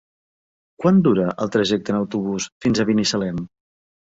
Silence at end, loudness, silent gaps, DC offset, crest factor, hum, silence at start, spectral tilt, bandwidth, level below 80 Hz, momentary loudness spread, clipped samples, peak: 0.7 s; -20 LUFS; 2.52-2.61 s; under 0.1%; 16 dB; none; 0.8 s; -5.5 dB/octave; 8 kHz; -54 dBFS; 10 LU; under 0.1%; -4 dBFS